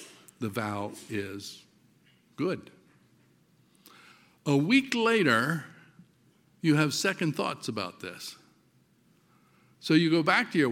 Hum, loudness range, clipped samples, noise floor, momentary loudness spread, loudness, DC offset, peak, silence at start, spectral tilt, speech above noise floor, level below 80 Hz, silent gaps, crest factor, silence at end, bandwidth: none; 12 LU; under 0.1%; -65 dBFS; 18 LU; -28 LUFS; under 0.1%; -8 dBFS; 0 s; -5 dB/octave; 38 dB; -76 dBFS; none; 22 dB; 0 s; 16.5 kHz